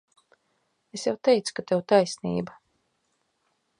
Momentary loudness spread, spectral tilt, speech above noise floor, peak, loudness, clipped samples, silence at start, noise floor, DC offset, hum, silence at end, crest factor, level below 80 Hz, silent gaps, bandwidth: 12 LU; -5 dB/octave; 49 dB; -6 dBFS; -25 LUFS; under 0.1%; 0.95 s; -74 dBFS; under 0.1%; none; 1.3 s; 22 dB; -68 dBFS; none; 11 kHz